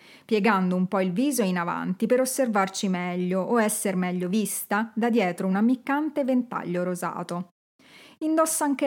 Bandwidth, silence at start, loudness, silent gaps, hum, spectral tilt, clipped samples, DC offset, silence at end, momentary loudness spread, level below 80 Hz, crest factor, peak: 17 kHz; 0.3 s; -25 LUFS; 7.51-7.79 s; none; -5 dB/octave; under 0.1%; under 0.1%; 0 s; 6 LU; -84 dBFS; 18 dB; -6 dBFS